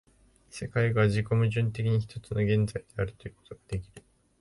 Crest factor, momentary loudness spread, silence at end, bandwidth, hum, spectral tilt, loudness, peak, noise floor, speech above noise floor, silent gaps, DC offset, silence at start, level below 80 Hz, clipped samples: 16 dB; 14 LU; 0.4 s; 11.5 kHz; none; -7.5 dB/octave; -29 LUFS; -12 dBFS; -60 dBFS; 32 dB; none; under 0.1%; 0.55 s; -50 dBFS; under 0.1%